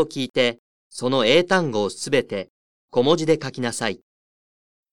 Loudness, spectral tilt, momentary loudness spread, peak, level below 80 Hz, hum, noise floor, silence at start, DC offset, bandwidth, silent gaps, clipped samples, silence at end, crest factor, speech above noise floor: -21 LUFS; -4.5 dB/octave; 15 LU; -4 dBFS; -60 dBFS; none; under -90 dBFS; 0 s; 0.6%; 12.5 kHz; 0.30-0.34 s, 0.59-0.90 s, 2.50-2.88 s; under 0.1%; 0.95 s; 20 dB; over 69 dB